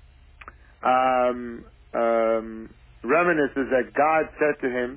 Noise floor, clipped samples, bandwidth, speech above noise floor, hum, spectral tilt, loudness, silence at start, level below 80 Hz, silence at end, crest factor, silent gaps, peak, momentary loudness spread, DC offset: -47 dBFS; under 0.1%; 4 kHz; 24 dB; none; -9 dB/octave; -23 LUFS; 0.45 s; -52 dBFS; 0 s; 14 dB; none; -10 dBFS; 17 LU; under 0.1%